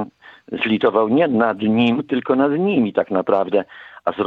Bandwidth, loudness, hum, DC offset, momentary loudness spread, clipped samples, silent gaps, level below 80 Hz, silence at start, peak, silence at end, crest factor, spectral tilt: 4.7 kHz; -18 LUFS; none; under 0.1%; 10 LU; under 0.1%; none; -64 dBFS; 0 s; -2 dBFS; 0 s; 16 dB; -8.5 dB/octave